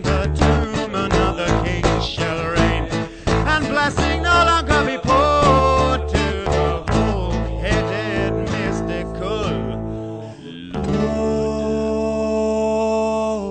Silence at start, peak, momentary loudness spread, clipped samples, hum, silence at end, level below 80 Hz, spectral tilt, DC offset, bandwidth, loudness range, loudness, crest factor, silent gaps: 0 s; -2 dBFS; 10 LU; under 0.1%; none; 0 s; -28 dBFS; -5.5 dB/octave; under 0.1%; 9 kHz; 7 LU; -19 LUFS; 16 dB; none